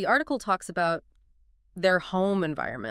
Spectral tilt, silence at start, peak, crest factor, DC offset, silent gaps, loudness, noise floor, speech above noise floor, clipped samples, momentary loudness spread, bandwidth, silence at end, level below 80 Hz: -5.5 dB/octave; 0 s; -10 dBFS; 18 dB; under 0.1%; none; -27 LUFS; -62 dBFS; 36 dB; under 0.1%; 7 LU; 15 kHz; 0 s; -58 dBFS